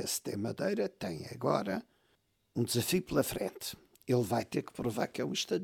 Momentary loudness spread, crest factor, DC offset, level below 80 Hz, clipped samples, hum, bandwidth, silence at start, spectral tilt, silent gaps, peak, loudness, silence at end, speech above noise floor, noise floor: 10 LU; 18 dB; under 0.1%; -64 dBFS; under 0.1%; none; 19 kHz; 0 s; -4.5 dB/octave; none; -16 dBFS; -34 LUFS; 0 s; 40 dB; -74 dBFS